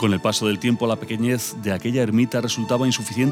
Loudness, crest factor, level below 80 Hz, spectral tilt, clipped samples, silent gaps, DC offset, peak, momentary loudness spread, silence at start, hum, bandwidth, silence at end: -22 LUFS; 14 dB; -62 dBFS; -5 dB/octave; under 0.1%; none; under 0.1%; -8 dBFS; 4 LU; 0 s; none; 17 kHz; 0 s